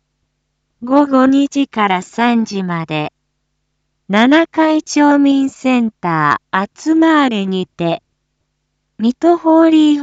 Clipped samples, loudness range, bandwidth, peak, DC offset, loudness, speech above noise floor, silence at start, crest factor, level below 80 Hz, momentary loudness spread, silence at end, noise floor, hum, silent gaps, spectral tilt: under 0.1%; 3 LU; 8 kHz; 0 dBFS; under 0.1%; -13 LUFS; 56 dB; 0.8 s; 14 dB; -60 dBFS; 9 LU; 0 s; -69 dBFS; none; none; -5.5 dB/octave